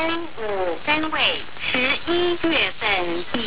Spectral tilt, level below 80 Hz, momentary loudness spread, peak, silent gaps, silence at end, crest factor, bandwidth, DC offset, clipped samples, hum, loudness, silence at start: -7.5 dB/octave; -48 dBFS; 6 LU; -4 dBFS; none; 0 s; 18 dB; 4 kHz; 3%; under 0.1%; none; -21 LUFS; 0 s